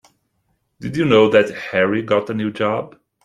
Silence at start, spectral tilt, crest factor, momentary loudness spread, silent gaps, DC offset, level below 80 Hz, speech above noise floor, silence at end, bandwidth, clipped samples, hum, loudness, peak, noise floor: 0.8 s; -6.5 dB/octave; 18 dB; 14 LU; none; under 0.1%; -56 dBFS; 51 dB; 0.35 s; 11 kHz; under 0.1%; none; -17 LUFS; -2 dBFS; -68 dBFS